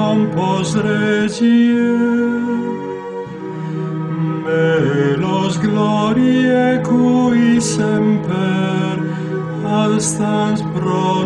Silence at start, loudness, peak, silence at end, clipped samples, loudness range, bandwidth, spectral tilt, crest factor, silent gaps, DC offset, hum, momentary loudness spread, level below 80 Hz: 0 s; -16 LUFS; -2 dBFS; 0 s; under 0.1%; 4 LU; 11 kHz; -6 dB/octave; 12 dB; none; under 0.1%; none; 9 LU; -52 dBFS